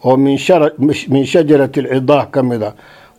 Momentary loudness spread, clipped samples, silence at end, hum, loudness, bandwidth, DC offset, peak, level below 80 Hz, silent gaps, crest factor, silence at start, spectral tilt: 6 LU; under 0.1%; 0.45 s; none; -13 LUFS; 13 kHz; under 0.1%; 0 dBFS; -54 dBFS; none; 12 dB; 0.05 s; -7 dB/octave